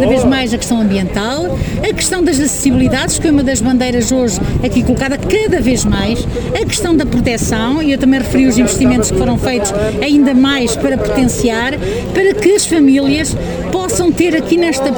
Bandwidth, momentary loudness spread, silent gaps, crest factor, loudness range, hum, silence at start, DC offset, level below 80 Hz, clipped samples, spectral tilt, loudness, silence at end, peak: over 20 kHz; 6 LU; none; 12 dB; 2 LU; none; 0 s; 0.1%; -26 dBFS; under 0.1%; -4.5 dB/octave; -13 LUFS; 0 s; 0 dBFS